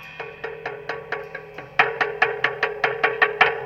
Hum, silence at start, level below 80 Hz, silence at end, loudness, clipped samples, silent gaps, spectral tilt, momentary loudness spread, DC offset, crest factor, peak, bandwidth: none; 0 s; -60 dBFS; 0 s; -22 LUFS; under 0.1%; none; -4 dB/octave; 15 LU; under 0.1%; 24 dB; 0 dBFS; 13 kHz